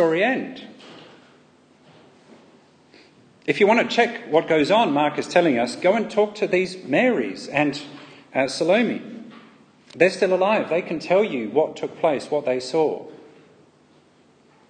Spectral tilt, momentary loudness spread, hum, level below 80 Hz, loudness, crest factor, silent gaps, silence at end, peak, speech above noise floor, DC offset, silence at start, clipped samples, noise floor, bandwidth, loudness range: -5 dB/octave; 14 LU; none; -70 dBFS; -21 LUFS; 20 dB; none; 1.55 s; -2 dBFS; 35 dB; under 0.1%; 0 s; under 0.1%; -56 dBFS; 9.8 kHz; 6 LU